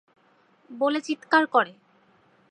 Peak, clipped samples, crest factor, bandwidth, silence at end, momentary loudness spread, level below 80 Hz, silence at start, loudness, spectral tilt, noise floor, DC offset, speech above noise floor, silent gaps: -6 dBFS; under 0.1%; 22 dB; 10 kHz; 0.85 s; 11 LU; -86 dBFS; 0.7 s; -24 LUFS; -3.5 dB/octave; -62 dBFS; under 0.1%; 38 dB; none